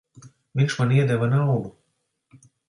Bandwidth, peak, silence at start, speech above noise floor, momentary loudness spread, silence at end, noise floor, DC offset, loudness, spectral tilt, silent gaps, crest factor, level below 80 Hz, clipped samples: 11 kHz; -8 dBFS; 0.15 s; 53 dB; 10 LU; 1 s; -74 dBFS; under 0.1%; -22 LUFS; -7 dB/octave; none; 16 dB; -62 dBFS; under 0.1%